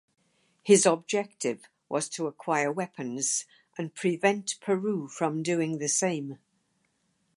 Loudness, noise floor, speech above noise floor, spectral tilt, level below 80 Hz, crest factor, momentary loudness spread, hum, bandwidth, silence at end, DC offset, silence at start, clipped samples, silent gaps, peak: -28 LUFS; -73 dBFS; 46 dB; -4 dB/octave; -80 dBFS; 22 dB; 13 LU; none; 11.5 kHz; 1 s; under 0.1%; 0.65 s; under 0.1%; none; -6 dBFS